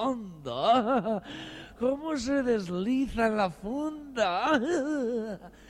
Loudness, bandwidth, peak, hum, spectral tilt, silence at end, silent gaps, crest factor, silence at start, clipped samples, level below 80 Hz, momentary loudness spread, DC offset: -29 LUFS; 12 kHz; -12 dBFS; none; -5.5 dB/octave; 0 s; none; 18 dB; 0 s; under 0.1%; -54 dBFS; 11 LU; under 0.1%